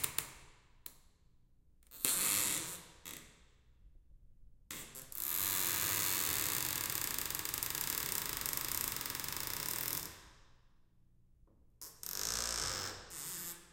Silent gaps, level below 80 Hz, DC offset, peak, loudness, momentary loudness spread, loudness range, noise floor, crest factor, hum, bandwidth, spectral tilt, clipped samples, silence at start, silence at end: none; -62 dBFS; under 0.1%; -8 dBFS; -36 LUFS; 17 LU; 7 LU; -66 dBFS; 32 dB; none; 17 kHz; -0.5 dB/octave; under 0.1%; 0 s; 0.05 s